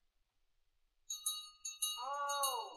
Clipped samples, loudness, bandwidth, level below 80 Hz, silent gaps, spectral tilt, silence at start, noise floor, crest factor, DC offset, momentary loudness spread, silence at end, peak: under 0.1%; -40 LUFS; 16 kHz; -80 dBFS; none; 3.5 dB/octave; 1.1 s; -78 dBFS; 20 dB; under 0.1%; 9 LU; 0 s; -24 dBFS